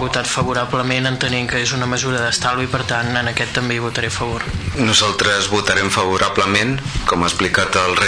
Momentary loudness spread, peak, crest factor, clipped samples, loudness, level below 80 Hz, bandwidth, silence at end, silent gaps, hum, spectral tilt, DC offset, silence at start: 5 LU; -4 dBFS; 14 dB; under 0.1%; -17 LUFS; -36 dBFS; 11 kHz; 0 s; none; none; -3.5 dB/octave; under 0.1%; 0 s